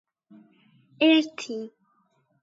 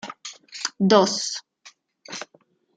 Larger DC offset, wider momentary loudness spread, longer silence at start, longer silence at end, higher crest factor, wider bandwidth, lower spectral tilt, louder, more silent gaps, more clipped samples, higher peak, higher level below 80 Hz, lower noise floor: neither; second, 17 LU vs 20 LU; first, 1 s vs 0.05 s; first, 0.75 s vs 0.5 s; about the same, 20 dB vs 22 dB; second, 7.8 kHz vs 9.4 kHz; about the same, -3.5 dB/octave vs -4 dB/octave; second, -24 LUFS vs -21 LUFS; neither; neither; second, -8 dBFS vs -2 dBFS; second, -86 dBFS vs -72 dBFS; first, -68 dBFS vs -61 dBFS